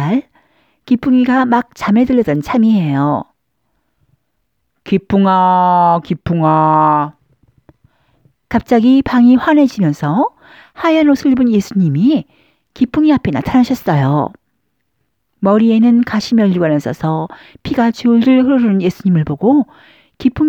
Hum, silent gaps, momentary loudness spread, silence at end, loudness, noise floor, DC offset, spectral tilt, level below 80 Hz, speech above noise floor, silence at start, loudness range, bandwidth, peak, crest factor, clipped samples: none; none; 8 LU; 0 s; -13 LUFS; -69 dBFS; under 0.1%; -8 dB/octave; -44 dBFS; 57 dB; 0 s; 3 LU; 15 kHz; 0 dBFS; 12 dB; under 0.1%